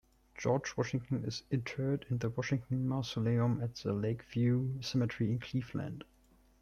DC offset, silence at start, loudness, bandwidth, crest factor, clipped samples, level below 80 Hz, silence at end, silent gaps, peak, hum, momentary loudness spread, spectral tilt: under 0.1%; 0.35 s; -35 LUFS; 7.2 kHz; 16 dB; under 0.1%; -62 dBFS; 0.6 s; none; -18 dBFS; none; 6 LU; -7 dB/octave